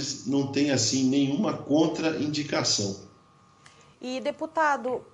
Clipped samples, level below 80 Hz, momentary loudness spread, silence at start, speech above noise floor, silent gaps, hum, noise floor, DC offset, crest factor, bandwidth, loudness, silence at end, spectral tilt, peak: under 0.1%; -68 dBFS; 9 LU; 0 s; 32 dB; none; none; -58 dBFS; under 0.1%; 16 dB; 11.5 kHz; -26 LUFS; 0.1 s; -4 dB/octave; -10 dBFS